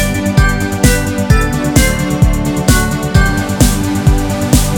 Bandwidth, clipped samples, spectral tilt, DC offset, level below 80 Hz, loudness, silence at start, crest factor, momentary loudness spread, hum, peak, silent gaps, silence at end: 19.5 kHz; 0.4%; -5 dB/octave; under 0.1%; -16 dBFS; -12 LUFS; 0 s; 12 dB; 2 LU; none; 0 dBFS; none; 0 s